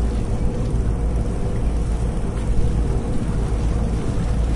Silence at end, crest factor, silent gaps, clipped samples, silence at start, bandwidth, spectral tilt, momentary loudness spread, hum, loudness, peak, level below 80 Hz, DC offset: 0 s; 12 dB; none; under 0.1%; 0 s; 11 kHz; -7.5 dB/octave; 2 LU; none; -23 LUFS; -8 dBFS; -22 dBFS; under 0.1%